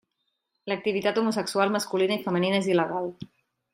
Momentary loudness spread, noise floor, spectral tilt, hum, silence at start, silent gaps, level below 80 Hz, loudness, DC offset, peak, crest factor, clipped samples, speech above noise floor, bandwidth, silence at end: 12 LU; -79 dBFS; -5 dB/octave; none; 0.65 s; none; -72 dBFS; -26 LUFS; under 0.1%; -8 dBFS; 18 dB; under 0.1%; 53 dB; 16 kHz; 0.5 s